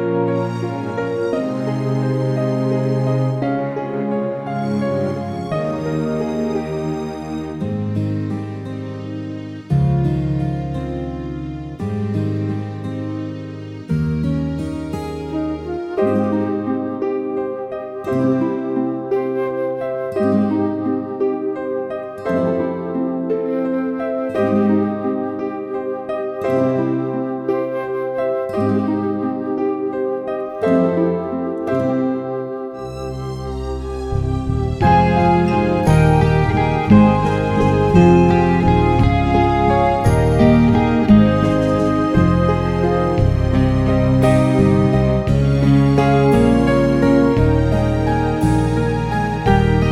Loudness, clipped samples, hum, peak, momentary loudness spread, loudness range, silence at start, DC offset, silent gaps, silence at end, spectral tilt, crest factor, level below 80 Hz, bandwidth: -18 LUFS; under 0.1%; none; 0 dBFS; 12 LU; 9 LU; 0 s; under 0.1%; none; 0 s; -8.5 dB/octave; 16 dB; -30 dBFS; 12 kHz